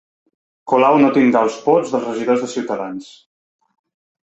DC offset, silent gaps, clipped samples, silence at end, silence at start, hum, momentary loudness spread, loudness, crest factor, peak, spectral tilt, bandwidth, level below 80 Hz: under 0.1%; none; under 0.1%; 1.2 s; 0.65 s; none; 12 LU; -16 LUFS; 16 dB; -2 dBFS; -6 dB/octave; 8.2 kHz; -64 dBFS